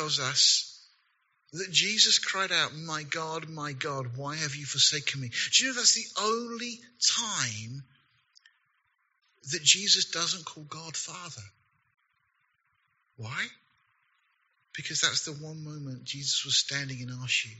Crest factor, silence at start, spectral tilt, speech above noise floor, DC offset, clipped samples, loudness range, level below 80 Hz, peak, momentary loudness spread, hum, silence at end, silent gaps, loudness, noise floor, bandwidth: 26 dB; 0 s; -0.5 dB/octave; 45 dB; under 0.1%; under 0.1%; 14 LU; -76 dBFS; -6 dBFS; 19 LU; none; 0 s; none; -26 LUFS; -74 dBFS; 8 kHz